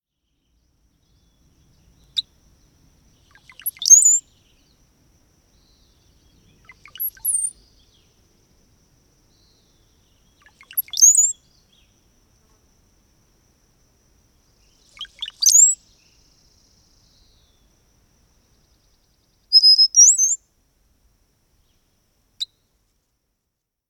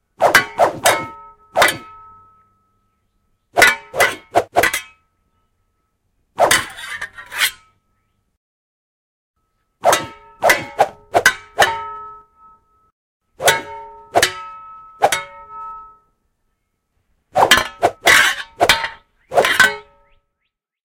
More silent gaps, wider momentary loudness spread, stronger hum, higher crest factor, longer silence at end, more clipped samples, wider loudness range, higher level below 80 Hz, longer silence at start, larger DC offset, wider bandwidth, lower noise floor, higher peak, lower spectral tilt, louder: second, none vs 8.37-9.34 s, 12.92-13.20 s; about the same, 22 LU vs 20 LU; neither; about the same, 24 dB vs 20 dB; first, 1.45 s vs 1.15 s; neither; first, 15 LU vs 8 LU; second, -62 dBFS vs -50 dBFS; first, 2.15 s vs 0.2 s; neither; first, 19.5 kHz vs 16.5 kHz; first, -79 dBFS vs -75 dBFS; about the same, 0 dBFS vs 0 dBFS; second, 4.5 dB/octave vs -1 dB/octave; first, -13 LUFS vs -16 LUFS